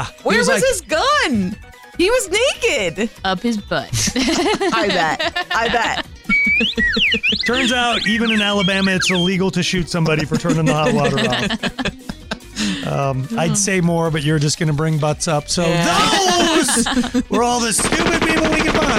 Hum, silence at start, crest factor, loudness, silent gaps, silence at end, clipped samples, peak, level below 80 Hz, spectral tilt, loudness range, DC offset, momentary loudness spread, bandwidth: none; 0 s; 12 dB; -16 LUFS; none; 0 s; under 0.1%; -6 dBFS; -38 dBFS; -3.5 dB/octave; 4 LU; under 0.1%; 7 LU; 16 kHz